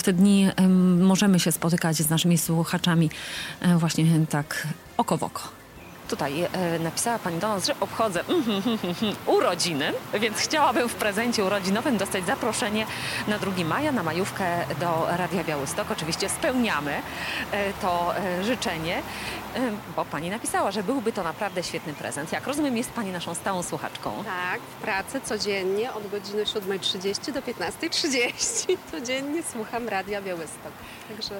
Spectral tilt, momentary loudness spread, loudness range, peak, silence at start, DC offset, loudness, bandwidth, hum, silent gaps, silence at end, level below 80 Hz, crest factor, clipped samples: -4.5 dB/octave; 10 LU; 5 LU; -8 dBFS; 0 s; under 0.1%; -25 LUFS; 17 kHz; none; none; 0 s; -56 dBFS; 16 dB; under 0.1%